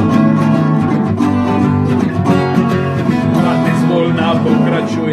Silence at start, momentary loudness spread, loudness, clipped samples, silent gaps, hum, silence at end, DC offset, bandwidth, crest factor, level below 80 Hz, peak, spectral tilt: 0 s; 3 LU; -13 LUFS; under 0.1%; none; none; 0 s; under 0.1%; 13 kHz; 12 dB; -44 dBFS; 0 dBFS; -8 dB/octave